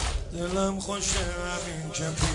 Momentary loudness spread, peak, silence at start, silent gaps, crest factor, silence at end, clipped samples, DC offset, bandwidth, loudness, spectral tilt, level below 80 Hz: 6 LU; -12 dBFS; 0 s; none; 18 dB; 0 s; under 0.1%; under 0.1%; 11 kHz; -29 LUFS; -3.5 dB/octave; -36 dBFS